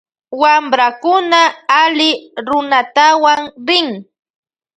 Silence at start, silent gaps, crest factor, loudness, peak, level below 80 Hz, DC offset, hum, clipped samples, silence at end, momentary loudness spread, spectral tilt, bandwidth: 0.3 s; none; 14 dB; -12 LUFS; 0 dBFS; -64 dBFS; under 0.1%; none; under 0.1%; 0.75 s; 8 LU; -2 dB/octave; 9.2 kHz